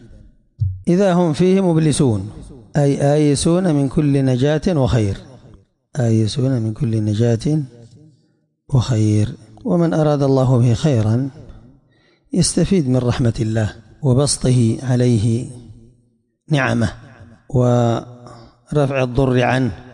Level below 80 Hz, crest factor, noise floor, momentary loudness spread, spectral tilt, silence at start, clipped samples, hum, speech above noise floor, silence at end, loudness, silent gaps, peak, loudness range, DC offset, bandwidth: -40 dBFS; 12 dB; -62 dBFS; 9 LU; -6.5 dB/octave; 0.6 s; under 0.1%; none; 46 dB; 0.05 s; -17 LUFS; none; -6 dBFS; 4 LU; under 0.1%; 11.5 kHz